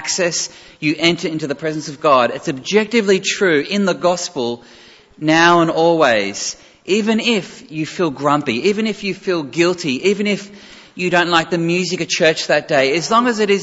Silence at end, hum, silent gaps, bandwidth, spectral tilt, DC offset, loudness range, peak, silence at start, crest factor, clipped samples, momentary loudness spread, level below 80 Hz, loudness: 0 s; none; none; 8 kHz; -4 dB/octave; under 0.1%; 3 LU; 0 dBFS; 0 s; 16 dB; under 0.1%; 10 LU; -58 dBFS; -16 LUFS